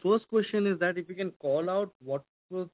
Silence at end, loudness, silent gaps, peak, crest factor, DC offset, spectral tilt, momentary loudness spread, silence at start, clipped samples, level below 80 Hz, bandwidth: 0.05 s; -30 LUFS; 1.36-1.40 s, 1.95-2.00 s, 2.29-2.49 s; -14 dBFS; 16 dB; under 0.1%; -10 dB/octave; 10 LU; 0.05 s; under 0.1%; -78 dBFS; 4 kHz